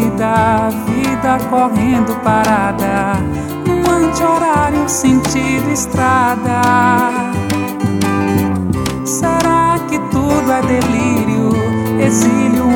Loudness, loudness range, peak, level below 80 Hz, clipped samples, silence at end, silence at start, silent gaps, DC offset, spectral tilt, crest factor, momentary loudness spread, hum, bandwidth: -14 LUFS; 2 LU; 0 dBFS; -36 dBFS; under 0.1%; 0 s; 0 s; none; under 0.1%; -5.5 dB/octave; 12 dB; 5 LU; none; 19.5 kHz